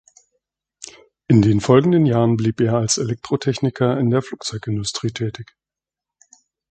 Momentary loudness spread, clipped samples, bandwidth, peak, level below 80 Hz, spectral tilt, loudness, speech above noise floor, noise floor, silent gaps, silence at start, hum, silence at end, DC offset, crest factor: 16 LU; under 0.1%; 9.2 kHz; 0 dBFS; -50 dBFS; -6 dB/octave; -19 LUFS; 70 dB; -88 dBFS; none; 0.8 s; none; 1.3 s; under 0.1%; 20 dB